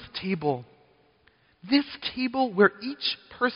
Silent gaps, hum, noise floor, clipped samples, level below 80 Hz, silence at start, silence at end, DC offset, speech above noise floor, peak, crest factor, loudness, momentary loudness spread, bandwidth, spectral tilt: none; none; -63 dBFS; under 0.1%; -64 dBFS; 0 s; 0 s; under 0.1%; 37 dB; -6 dBFS; 22 dB; -26 LUFS; 9 LU; 5.4 kHz; -3 dB/octave